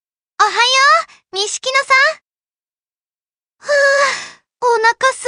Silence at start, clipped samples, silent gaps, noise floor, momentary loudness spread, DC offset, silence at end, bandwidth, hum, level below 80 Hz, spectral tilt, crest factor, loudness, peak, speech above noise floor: 0.4 s; under 0.1%; 2.79-2.86 s, 3.34-3.38 s; under -90 dBFS; 14 LU; under 0.1%; 0 s; 11 kHz; none; -72 dBFS; 1.5 dB/octave; 16 dB; -13 LUFS; 0 dBFS; over 76 dB